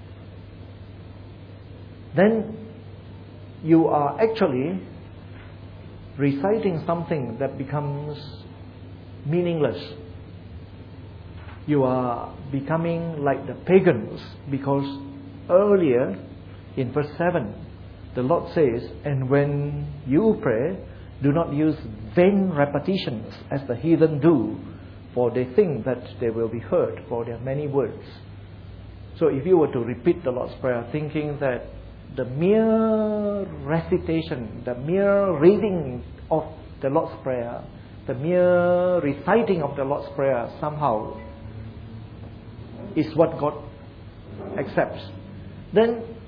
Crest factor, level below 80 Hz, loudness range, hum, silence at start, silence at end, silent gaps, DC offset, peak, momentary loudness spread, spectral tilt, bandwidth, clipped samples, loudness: 20 dB; -48 dBFS; 6 LU; none; 0 s; 0 s; none; under 0.1%; -4 dBFS; 23 LU; -10.5 dB/octave; 5.2 kHz; under 0.1%; -23 LUFS